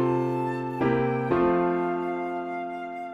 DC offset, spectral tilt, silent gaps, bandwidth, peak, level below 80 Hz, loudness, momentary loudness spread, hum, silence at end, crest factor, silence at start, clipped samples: under 0.1%; -9 dB/octave; none; 6.2 kHz; -10 dBFS; -54 dBFS; -27 LUFS; 9 LU; none; 0 s; 16 dB; 0 s; under 0.1%